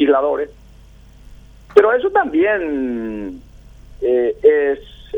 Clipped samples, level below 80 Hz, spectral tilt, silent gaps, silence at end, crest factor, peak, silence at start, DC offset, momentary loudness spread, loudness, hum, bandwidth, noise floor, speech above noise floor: under 0.1%; -44 dBFS; -6.5 dB/octave; none; 0 s; 18 dB; 0 dBFS; 0 s; under 0.1%; 13 LU; -17 LUFS; none; 5.8 kHz; -43 dBFS; 27 dB